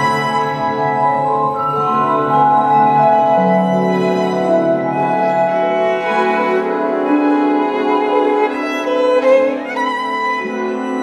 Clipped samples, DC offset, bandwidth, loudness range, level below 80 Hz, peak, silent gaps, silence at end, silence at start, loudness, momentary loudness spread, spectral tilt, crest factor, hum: under 0.1%; under 0.1%; 12.5 kHz; 2 LU; -60 dBFS; -2 dBFS; none; 0 s; 0 s; -15 LUFS; 6 LU; -6.5 dB/octave; 12 dB; none